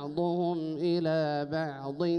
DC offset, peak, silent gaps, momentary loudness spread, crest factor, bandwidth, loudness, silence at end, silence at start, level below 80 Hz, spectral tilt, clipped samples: under 0.1%; -18 dBFS; none; 5 LU; 12 dB; 6.4 kHz; -31 LUFS; 0 s; 0 s; -70 dBFS; -8.5 dB/octave; under 0.1%